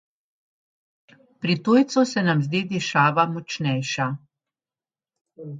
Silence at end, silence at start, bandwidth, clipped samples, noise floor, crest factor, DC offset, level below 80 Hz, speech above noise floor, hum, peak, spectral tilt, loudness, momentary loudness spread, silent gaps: 0 s; 1.4 s; 9.2 kHz; under 0.1%; under -90 dBFS; 20 dB; under 0.1%; -68 dBFS; over 69 dB; none; -4 dBFS; -5.5 dB/octave; -22 LUFS; 10 LU; 5.21-5.25 s